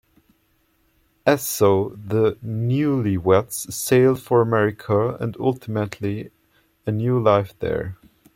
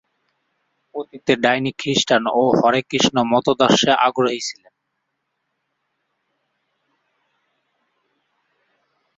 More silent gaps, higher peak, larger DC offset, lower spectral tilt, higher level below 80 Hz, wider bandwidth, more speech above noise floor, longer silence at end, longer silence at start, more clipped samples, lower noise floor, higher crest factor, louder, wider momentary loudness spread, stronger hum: neither; about the same, -2 dBFS vs -2 dBFS; neither; first, -6 dB/octave vs -4 dB/octave; first, -54 dBFS vs -60 dBFS; first, 16.5 kHz vs 8 kHz; second, 44 dB vs 57 dB; second, 0.4 s vs 4.65 s; first, 1.25 s vs 0.95 s; neither; second, -64 dBFS vs -75 dBFS; about the same, 18 dB vs 20 dB; second, -21 LUFS vs -17 LUFS; second, 10 LU vs 14 LU; neither